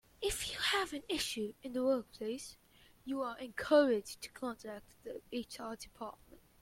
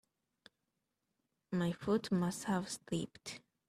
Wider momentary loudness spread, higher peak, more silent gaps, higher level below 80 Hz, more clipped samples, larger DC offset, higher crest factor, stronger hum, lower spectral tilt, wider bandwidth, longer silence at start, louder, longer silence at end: first, 18 LU vs 11 LU; first, -16 dBFS vs -22 dBFS; neither; first, -62 dBFS vs -72 dBFS; neither; neither; about the same, 22 dB vs 18 dB; neither; second, -2.5 dB/octave vs -5.5 dB/octave; first, 16.5 kHz vs 14 kHz; second, 0.2 s vs 1.5 s; about the same, -37 LUFS vs -38 LUFS; first, 0.45 s vs 0.3 s